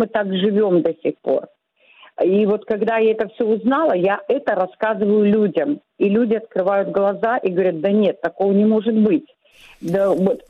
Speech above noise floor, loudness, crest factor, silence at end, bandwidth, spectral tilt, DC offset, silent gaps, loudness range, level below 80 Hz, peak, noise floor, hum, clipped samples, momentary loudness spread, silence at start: 34 dB; -18 LUFS; 12 dB; 0.1 s; 6.2 kHz; -8.5 dB/octave; under 0.1%; none; 1 LU; -62 dBFS; -6 dBFS; -52 dBFS; none; under 0.1%; 6 LU; 0 s